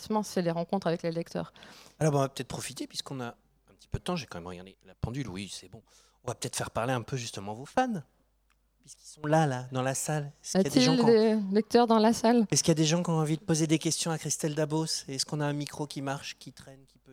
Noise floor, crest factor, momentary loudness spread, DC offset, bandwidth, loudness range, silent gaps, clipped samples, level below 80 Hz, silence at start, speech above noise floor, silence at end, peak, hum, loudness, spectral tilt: -71 dBFS; 20 dB; 16 LU; under 0.1%; 16.5 kHz; 13 LU; none; under 0.1%; -58 dBFS; 0 s; 41 dB; 0 s; -10 dBFS; none; -29 LUFS; -5 dB/octave